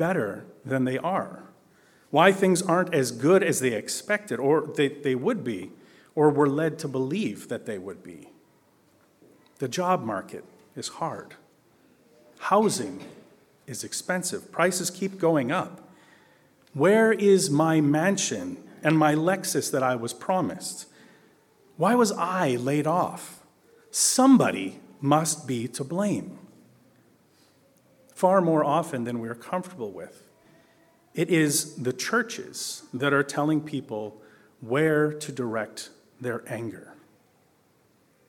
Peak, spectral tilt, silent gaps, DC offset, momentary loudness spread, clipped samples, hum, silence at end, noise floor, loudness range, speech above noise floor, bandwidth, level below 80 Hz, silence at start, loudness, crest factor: -2 dBFS; -4.5 dB/octave; none; under 0.1%; 16 LU; under 0.1%; none; 1.35 s; -63 dBFS; 8 LU; 39 dB; 18 kHz; -74 dBFS; 0 s; -25 LUFS; 24 dB